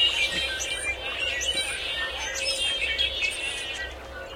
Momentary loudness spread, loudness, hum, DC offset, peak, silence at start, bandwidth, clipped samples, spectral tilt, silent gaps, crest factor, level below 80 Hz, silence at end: 7 LU; -26 LUFS; none; under 0.1%; -12 dBFS; 0 s; 16.5 kHz; under 0.1%; 0 dB/octave; none; 16 dB; -46 dBFS; 0 s